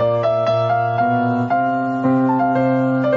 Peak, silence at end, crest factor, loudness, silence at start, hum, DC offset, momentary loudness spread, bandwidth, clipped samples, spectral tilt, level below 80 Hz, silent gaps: -6 dBFS; 0 s; 12 dB; -17 LUFS; 0 s; none; under 0.1%; 2 LU; 6.6 kHz; under 0.1%; -9 dB/octave; -56 dBFS; none